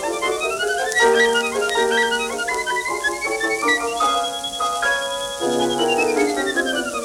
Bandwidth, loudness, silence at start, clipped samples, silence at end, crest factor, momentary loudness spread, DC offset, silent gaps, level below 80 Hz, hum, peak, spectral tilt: 19 kHz; -19 LUFS; 0 s; under 0.1%; 0 s; 16 dB; 6 LU; under 0.1%; none; -52 dBFS; none; -4 dBFS; -1.5 dB/octave